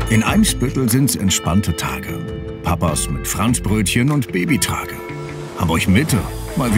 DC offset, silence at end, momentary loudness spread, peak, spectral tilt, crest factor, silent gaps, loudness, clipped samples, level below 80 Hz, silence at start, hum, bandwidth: under 0.1%; 0 s; 11 LU; -2 dBFS; -4.5 dB/octave; 16 dB; none; -18 LUFS; under 0.1%; -32 dBFS; 0 s; none; 16.5 kHz